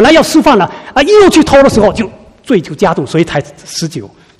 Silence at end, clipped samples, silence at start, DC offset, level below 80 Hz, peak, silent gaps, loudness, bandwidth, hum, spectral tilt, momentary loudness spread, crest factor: 0.35 s; 2%; 0 s; under 0.1%; -32 dBFS; 0 dBFS; none; -9 LUFS; 15 kHz; none; -5 dB/octave; 14 LU; 8 dB